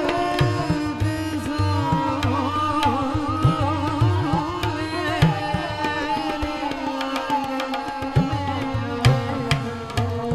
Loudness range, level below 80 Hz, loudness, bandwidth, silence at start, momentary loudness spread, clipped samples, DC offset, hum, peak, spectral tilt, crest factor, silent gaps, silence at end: 3 LU; -38 dBFS; -23 LUFS; 14 kHz; 0 s; 6 LU; under 0.1%; under 0.1%; none; -4 dBFS; -6.5 dB/octave; 18 dB; none; 0 s